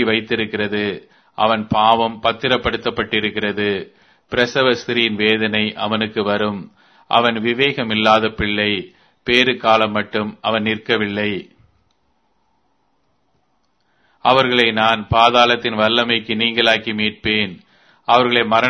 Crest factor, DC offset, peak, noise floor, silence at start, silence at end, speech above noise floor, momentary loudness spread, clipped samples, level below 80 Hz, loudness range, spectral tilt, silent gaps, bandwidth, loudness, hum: 18 dB; under 0.1%; 0 dBFS; -66 dBFS; 0 s; 0 s; 48 dB; 8 LU; under 0.1%; -48 dBFS; 8 LU; -5 dB/octave; none; 9.6 kHz; -17 LUFS; none